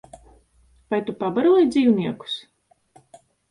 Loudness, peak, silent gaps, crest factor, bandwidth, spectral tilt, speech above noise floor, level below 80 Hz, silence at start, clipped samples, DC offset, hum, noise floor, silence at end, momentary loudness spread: -21 LUFS; -8 dBFS; none; 16 dB; 11 kHz; -6.5 dB/octave; 39 dB; -60 dBFS; 0.9 s; under 0.1%; under 0.1%; none; -58 dBFS; 1.1 s; 14 LU